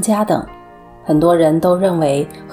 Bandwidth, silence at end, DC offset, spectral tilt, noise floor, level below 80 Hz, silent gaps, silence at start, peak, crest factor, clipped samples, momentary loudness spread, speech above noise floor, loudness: 18.5 kHz; 0 s; under 0.1%; -6.5 dB/octave; -39 dBFS; -46 dBFS; none; 0 s; -2 dBFS; 14 dB; under 0.1%; 9 LU; 25 dB; -15 LUFS